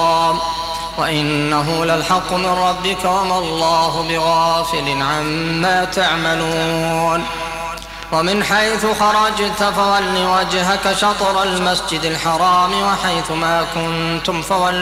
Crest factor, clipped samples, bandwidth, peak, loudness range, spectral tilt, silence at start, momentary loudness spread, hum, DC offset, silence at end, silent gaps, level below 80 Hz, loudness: 12 dB; under 0.1%; 16 kHz; -4 dBFS; 2 LU; -3.5 dB/octave; 0 s; 5 LU; none; under 0.1%; 0 s; none; -40 dBFS; -16 LUFS